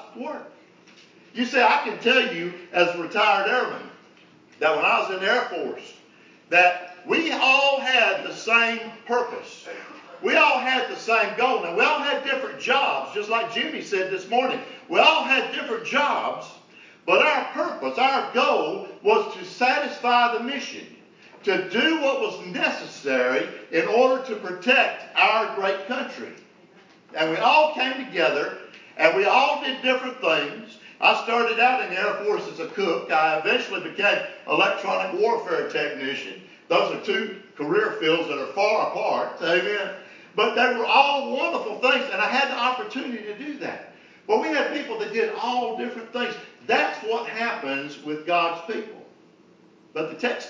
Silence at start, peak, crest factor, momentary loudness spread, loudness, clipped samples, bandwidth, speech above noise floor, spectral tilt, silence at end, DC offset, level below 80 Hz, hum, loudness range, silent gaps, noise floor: 0 s; -4 dBFS; 20 dB; 14 LU; -22 LUFS; under 0.1%; 7.6 kHz; 31 dB; -3 dB/octave; 0 s; under 0.1%; -86 dBFS; none; 4 LU; none; -54 dBFS